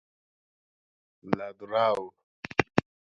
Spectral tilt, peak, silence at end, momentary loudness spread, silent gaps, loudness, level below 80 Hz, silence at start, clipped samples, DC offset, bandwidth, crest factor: -6 dB/octave; 0 dBFS; 0.25 s; 12 LU; 2.23-2.43 s; -29 LUFS; -60 dBFS; 1.25 s; under 0.1%; under 0.1%; 10.5 kHz; 30 dB